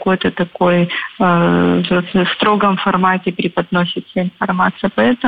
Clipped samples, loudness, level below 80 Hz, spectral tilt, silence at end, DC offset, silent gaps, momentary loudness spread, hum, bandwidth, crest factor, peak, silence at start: under 0.1%; -15 LUFS; -50 dBFS; -9 dB/octave; 0 s; 0.3%; none; 6 LU; none; 4.9 kHz; 14 dB; -2 dBFS; 0 s